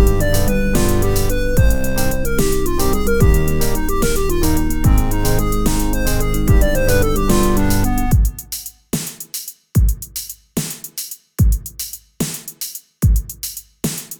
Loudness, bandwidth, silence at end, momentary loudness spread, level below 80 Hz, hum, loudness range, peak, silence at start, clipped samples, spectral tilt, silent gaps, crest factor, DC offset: -19 LUFS; over 20 kHz; 0 s; 11 LU; -18 dBFS; none; 5 LU; 0 dBFS; 0 s; under 0.1%; -5.5 dB/octave; none; 16 dB; under 0.1%